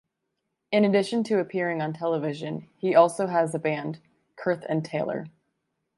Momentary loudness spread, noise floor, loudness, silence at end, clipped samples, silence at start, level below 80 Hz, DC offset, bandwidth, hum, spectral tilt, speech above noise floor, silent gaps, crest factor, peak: 14 LU; -80 dBFS; -26 LUFS; 0.7 s; under 0.1%; 0.7 s; -74 dBFS; under 0.1%; 11.5 kHz; none; -6.5 dB/octave; 55 dB; none; 22 dB; -4 dBFS